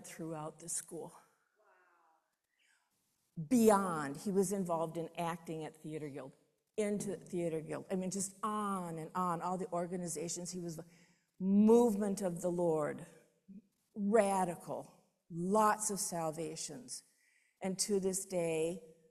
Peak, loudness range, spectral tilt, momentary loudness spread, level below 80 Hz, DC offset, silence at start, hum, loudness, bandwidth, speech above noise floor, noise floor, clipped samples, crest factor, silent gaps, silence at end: -14 dBFS; 6 LU; -5 dB/octave; 16 LU; -74 dBFS; under 0.1%; 0 s; none; -36 LUFS; 14.5 kHz; 45 dB; -81 dBFS; under 0.1%; 22 dB; none; 0.2 s